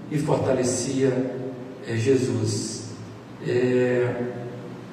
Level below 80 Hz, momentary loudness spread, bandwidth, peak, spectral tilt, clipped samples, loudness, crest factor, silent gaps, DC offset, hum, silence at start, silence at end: -62 dBFS; 15 LU; 14.5 kHz; -8 dBFS; -5.5 dB/octave; under 0.1%; -24 LUFS; 16 dB; none; under 0.1%; none; 0 s; 0 s